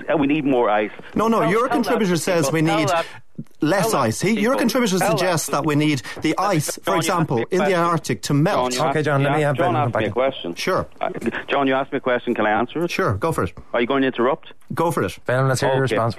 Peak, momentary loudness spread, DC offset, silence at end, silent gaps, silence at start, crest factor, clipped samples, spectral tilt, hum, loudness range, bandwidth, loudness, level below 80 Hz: -8 dBFS; 5 LU; 1%; 0 s; none; 0 s; 12 dB; under 0.1%; -5 dB/octave; none; 2 LU; 13.5 kHz; -20 LUFS; -52 dBFS